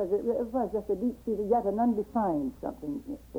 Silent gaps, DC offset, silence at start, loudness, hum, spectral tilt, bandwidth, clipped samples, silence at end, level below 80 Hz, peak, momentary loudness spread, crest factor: none; under 0.1%; 0 s; -30 LUFS; none; -9 dB/octave; 16.5 kHz; under 0.1%; 0 s; -54 dBFS; -14 dBFS; 10 LU; 16 dB